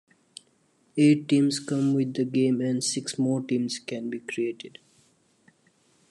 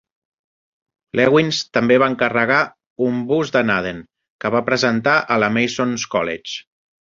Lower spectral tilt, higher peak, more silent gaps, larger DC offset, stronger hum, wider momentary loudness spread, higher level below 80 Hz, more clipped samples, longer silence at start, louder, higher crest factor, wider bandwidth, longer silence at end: about the same, -5.5 dB/octave vs -5 dB/octave; second, -10 dBFS vs -2 dBFS; second, none vs 2.86-2.96 s, 4.30-4.39 s; neither; neither; about the same, 12 LU vs 11 LU; second, -76 dBFS vs -56 dBFS; neither; second, 0.95 s vs 1.15 s; second, -26 LUFS vs -18 LUFS; about the same, 18 dB vs 18 dB; first, 12 kHz vs 7.6 kHz; first, 1.4 s vs 0.4 s